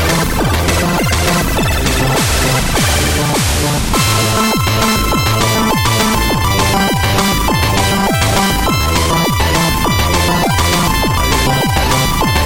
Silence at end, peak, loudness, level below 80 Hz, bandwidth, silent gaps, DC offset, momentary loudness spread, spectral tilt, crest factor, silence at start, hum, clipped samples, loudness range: 0 s; 0 dBFS; -12 LUFS; -20 dBFS; 17 kHz; none; under 0.1%; 1 LU; -4 dB/octave; 12 dB; 0 s; none; under 0.1%; 1 LU